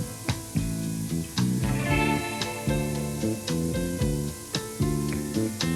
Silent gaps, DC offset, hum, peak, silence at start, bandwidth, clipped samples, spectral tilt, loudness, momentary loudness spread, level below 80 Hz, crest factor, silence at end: none; under 0.1%; none; -10 dBFS; 0 s; 18 kHz; under 0.1%; -5 dB/octave; -28 LUFS; 6 LU; -40 dBFS; 16 dB; 0 s